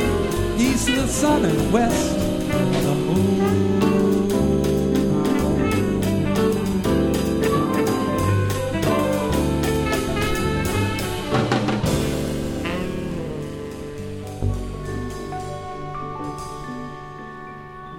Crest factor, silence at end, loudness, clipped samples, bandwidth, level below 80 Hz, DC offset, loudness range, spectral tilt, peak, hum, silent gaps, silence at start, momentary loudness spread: 16 dB; 0 s; -21 LUFS; under 0.1%; 18 kHz; -34 dBFS; under 0.1%; 10 LU; -6 dB/octave; -6 dBFS; none; none; 0 s; 13 LU